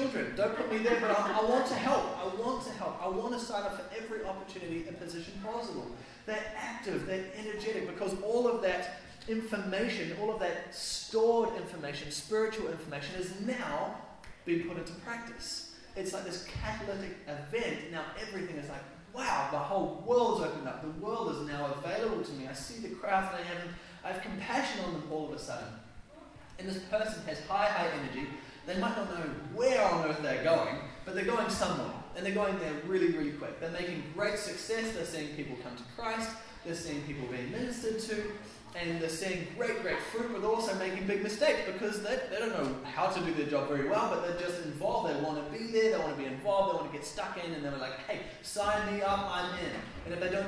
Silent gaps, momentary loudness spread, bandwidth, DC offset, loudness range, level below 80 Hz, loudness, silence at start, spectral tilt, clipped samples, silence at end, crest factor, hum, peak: none; 11 LU; 11 kHz; under 0.1%; 7 LU; -58 dBFS; -34 LUFS; 0 s; -4.5 dB/octave; under 0.1%; 0 s; 18 dB; none; -16 dBFS